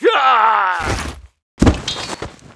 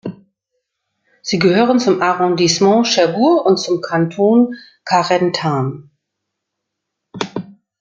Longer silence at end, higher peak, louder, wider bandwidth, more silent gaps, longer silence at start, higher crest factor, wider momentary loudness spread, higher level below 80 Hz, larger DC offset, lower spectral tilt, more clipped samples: second, 0.05 s vs 0.3 s; about the same, 0 dBFS vs -2 dBFS; about the same, -16 LUFS vs -15 LUFS; first, 11 kHz vs 7.8 kHz; first, 1.42-1.57 s vs none; about the same, 0 s vs 0.05 s; about the same, 16 dB vs 14 dB; about the same, 15 LU vs 14 LU; first, -28 dBFS vs -62 dBFS; neither; about the same, -5 dB/octave vs -5 dB/octave; neither